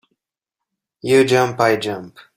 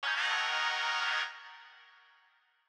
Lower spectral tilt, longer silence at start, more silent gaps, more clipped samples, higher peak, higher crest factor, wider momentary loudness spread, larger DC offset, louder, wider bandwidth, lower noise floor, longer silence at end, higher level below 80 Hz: first, -5 dB/octave vs 5.5 dB/octave; first, 1.05 s vs 0 s; neither; neither; first, -2 dBFS vs -20 dBFS; about the same, 18 dB vs 16 dB; second, 16 LU vs 20 LU; neither; first, -16 LUFS vs -31 LUFS; second, 16 kHz vs over 20 kHz; first, -84 dBFS vs -69 dBFS; second, 0.3 s vs 0.85 s; first, -58 dBFS vs under -90 dBFS